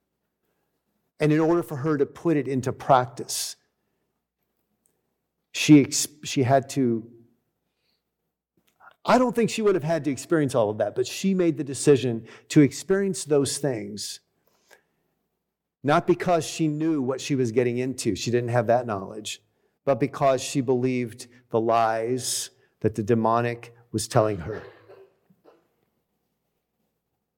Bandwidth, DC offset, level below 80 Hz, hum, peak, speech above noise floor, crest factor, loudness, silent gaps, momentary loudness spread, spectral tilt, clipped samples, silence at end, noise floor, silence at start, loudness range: 17.5 kHz; under 0.1%; -62 dBFS; none; -4 dBFS; 58 dB; 20 dB; -24 LUFS; none; 12 LU; -5.5 dB/octave; under 0.1%; 2.45 s; -82 dBFS; 1.2 s; 5 LU